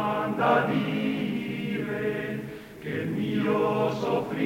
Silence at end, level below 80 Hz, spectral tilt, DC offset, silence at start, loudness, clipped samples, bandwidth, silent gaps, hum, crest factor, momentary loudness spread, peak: 0 s; -60 dBFS; -7 dB/octave; under 0.1%; 0 s; -27 LUFS; under 0.1%; 16 kHz; none; none; 18 dB; 11 LU; -10 dBFS